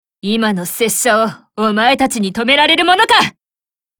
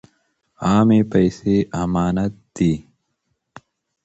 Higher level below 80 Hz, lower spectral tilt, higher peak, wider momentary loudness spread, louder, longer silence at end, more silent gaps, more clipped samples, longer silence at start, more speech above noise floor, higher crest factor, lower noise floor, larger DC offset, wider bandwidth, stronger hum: second, -52 dBFS vs -44 dBFS; second, -2.5 dB/octave vs -7.5 dB/octave; first, 0 dBFS vs -4 dBFS; about the same, 9 LU vs 10 LU; first, -13 LUFS vs -19 LUFS; second, 0.7 s vs 1.25 s; neither; neither; second, 0.25 s vs 0.6 s; first, over 77 dB vs 55 dB; about the same, 14 dB vs 16 dB; first, under -90 dBFS vs -73 dBFS; neither; first, over 20 kHz vs 8.2 kHz; neither